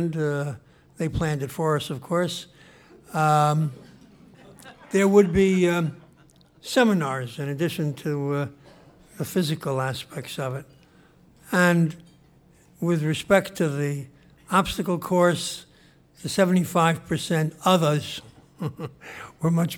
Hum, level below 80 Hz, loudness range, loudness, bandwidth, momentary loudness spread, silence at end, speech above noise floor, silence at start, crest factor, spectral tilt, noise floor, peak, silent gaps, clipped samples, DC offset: none; -52 dBFS; 5 LU; -24 LUFS; 18 kHz; 15 LU; 0 s; 33 dB; 0 s; 20 dB; -6 dB/octave; -56 dBFS; -4 dBFS; none; under 0.1%; under 0.1%